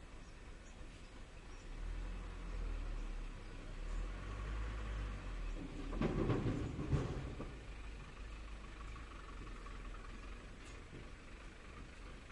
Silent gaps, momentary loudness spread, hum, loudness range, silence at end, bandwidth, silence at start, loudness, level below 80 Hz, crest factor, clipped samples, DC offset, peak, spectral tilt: none; 16 LU; none; 11 LU; 0 s; 11 kHz; 0 s; -47 LUFS; -48 dBFS; 20 dB; under 0.1%; under 0.1%; -24 dBFS; -6.5 dB/octave